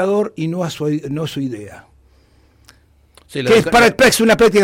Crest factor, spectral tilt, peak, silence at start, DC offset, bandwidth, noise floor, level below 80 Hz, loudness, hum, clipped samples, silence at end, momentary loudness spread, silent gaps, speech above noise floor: 14 dB; -4.5 dB/octave; -2 dBFS; 0 s; under 0.1%; 16.5 kHz; -52 dBFS; -44 dBFS; -15 LUFS; none; under 0.1%; 0 s; 14 LU; none; 37 dB